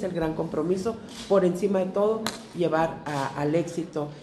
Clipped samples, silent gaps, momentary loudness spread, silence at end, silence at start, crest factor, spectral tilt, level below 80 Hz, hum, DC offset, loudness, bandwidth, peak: under 0.1%; none; 8 LU; 0 s; 0 s; 18 dB; -6 dB/octave; -56 dBFS; none; under 0.1%; -27 LUFS; 12.5 kHz; -8 dBFS